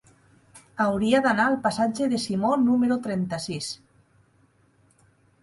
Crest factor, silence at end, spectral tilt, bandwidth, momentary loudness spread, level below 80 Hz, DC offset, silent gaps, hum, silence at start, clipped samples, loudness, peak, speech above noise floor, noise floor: 18 dB; 1.65 s; -5 dB/octave; 11.5 kHz; 11 LU; -60 dBFS; under 0.1%; none; none; 0.55 s; under 0.1%; -24 LUFS; -8 dBFS; 39 dB; -62 dBFS